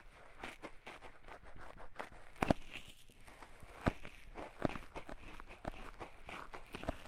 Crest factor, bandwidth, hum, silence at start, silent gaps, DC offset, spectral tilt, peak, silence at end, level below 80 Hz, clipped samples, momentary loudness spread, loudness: 30 dB; 16 kHz; none; 0 s; none; under 0.1%; -6 dB/octave; -16 dBFS; 0 s; -54 dBFS; under 0.1%; 17 LU; -46 LUFS